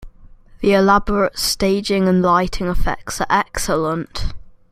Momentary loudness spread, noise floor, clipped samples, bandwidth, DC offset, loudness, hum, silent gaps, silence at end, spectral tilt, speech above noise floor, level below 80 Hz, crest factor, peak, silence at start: 10 LU; -43 dBFS; under 0.1%; 15.5 kHz; under 0.1%; -18 LUFS; none; none; 0.2 s; -4.5 dB/octave; 26 dB; -30 dBFS; 16 dB; -2 dBFS; 0 s